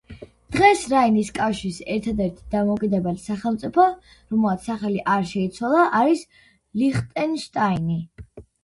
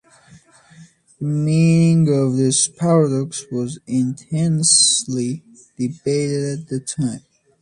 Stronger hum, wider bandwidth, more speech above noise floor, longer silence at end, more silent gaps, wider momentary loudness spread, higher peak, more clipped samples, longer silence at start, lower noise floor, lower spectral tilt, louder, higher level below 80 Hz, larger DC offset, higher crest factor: neither; about the same, 11.5 kHz vs 11.5 kHz; second, 21 dB vs 31 dB; second, 0.25 s vs 0.4 s; neither; second, 9 LU vs 13 LU; about the same, -2 dBFS vs -2 dBFS; neither; second, 0.1 s vs 0.8 s; second, -42 dBFS vs -49 dBFS; first, -6 dB/octave vs -4.5 dB/octave; second, -22 LUFS vs -18 LUFS; first, -48 dBFS vs -58 dBFS; neither; about the same, 20 dB vs 18 dB